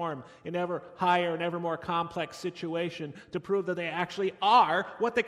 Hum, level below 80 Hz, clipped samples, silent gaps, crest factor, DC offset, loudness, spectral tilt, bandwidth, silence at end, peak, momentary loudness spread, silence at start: none; -70 dBFS; under 0.1%; none; 20 dB; under 0.1%; -29 LUFS; -5.5 dB/octave; 13 kHz; 0 s; -10 dBFS; 13 LU; 0 s